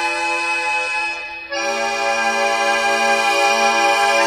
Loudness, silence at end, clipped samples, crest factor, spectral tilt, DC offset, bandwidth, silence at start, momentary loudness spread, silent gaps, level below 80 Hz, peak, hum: -17 LUFS; 0 s; under 0.1%; 14 dB; 0 dB/octave; under 0.1%; 16 kHz; 0 s; 7 LU; none; -56 dBFS; -4 dBFS; none